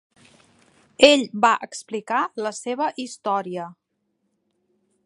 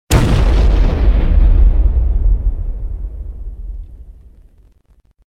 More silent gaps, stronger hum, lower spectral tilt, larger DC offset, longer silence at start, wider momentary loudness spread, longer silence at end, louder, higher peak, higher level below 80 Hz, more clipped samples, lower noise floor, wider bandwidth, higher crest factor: neither; neither; second, -3 dB/octave vs -6.5 dB/octave; neither; first, 1 s vs 0.1 s; about the same, 17 LU vs 18 LU; first, 1.35 s vs 1.15 s; second, -21 LUFS vs -15 LUFS; about the same, 0 dBFS vs 0 dBFS; second, -66 dBFS vs -14 dBFS; neither; first, -74 dBFS vs -52 dBFS; about the same, 11.5 kHz vs 12.5 kHz; first, 24 dB vs 12 dB